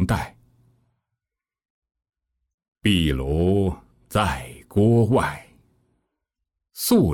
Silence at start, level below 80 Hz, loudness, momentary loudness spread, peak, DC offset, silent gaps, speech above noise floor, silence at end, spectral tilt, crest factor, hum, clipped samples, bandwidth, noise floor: 0 s; -40 dBFS; -22 LUFS; 16 LU; -6 dBFS; under 0.1%; 1.70-1.82 s, 2.54-2.58 s, 2.68-2.72 s; 69 dB; 0 s; -6 dB/octave; 18 dB; none; under 0.1%; 18 kHz; -88 dBFS